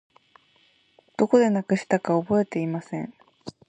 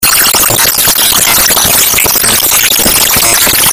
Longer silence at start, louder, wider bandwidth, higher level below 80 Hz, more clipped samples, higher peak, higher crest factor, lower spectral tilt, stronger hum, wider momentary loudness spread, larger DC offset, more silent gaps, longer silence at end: first, 1.2 s vs 0 s; second, -24 LUFS vs -4 LUFS; second, 9.6 kHz vs over 20 kHz; second, -66 dBFS vs -30 dBFS; second, under 0.1% vs 3%; second, -4 dBFS vs 0 dBFS; first, 20 dB vs 8 dB; first, -7 dB/octave vs 0 dB/octave; neither; first, 20 LU vs 1 LU; neither; neither; first, 0.2 s vs 0 s